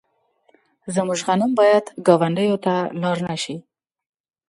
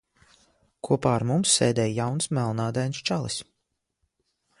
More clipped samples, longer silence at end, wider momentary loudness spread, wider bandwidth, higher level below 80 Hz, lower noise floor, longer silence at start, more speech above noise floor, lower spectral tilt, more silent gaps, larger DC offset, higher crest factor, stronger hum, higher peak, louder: neither; second, 0.9 s vs 1.2 s; about the same, 11 LU vs 9 LU; about the same, 11.5 kHz vs 11.5 kHz; second, -66 dBFS vs -58 dBFS; second, -63 dBFS vs -79 dBFS; about the same, 0.85 s vs 0.85 s; second, 44 dB vs 54 dB; about the same, -5.5 dB/octave vs -4.5 dB/octave; neither; neither; about the same, 20 dB vs 20 dB; neither; first, 0 dBFS vs -8 dBFS; first, -20 LUFS vs -25 LUFS